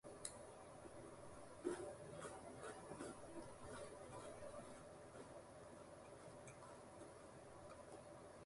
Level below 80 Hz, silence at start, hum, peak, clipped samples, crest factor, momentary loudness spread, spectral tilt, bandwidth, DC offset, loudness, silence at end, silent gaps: -74 dBFS; 0.05 s; none; -30 dBFS; under 0.1%; 26 dB; 8 LU; -4.5 dB/octave; 11.5 kHz; under 0.1%; -56 LUFS; 0 s; none